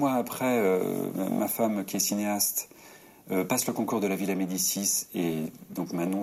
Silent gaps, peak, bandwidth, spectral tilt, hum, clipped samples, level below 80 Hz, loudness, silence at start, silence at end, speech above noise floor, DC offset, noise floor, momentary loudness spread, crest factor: none; -10 dBFS; 16 kHz; -4 dB/octave; none; under 0.1%; -72 dBFS; -28 LUFS; 0 s; 0 s; 24 dB; under 0.1%; -52 dBFS; 7 LU; 18 dB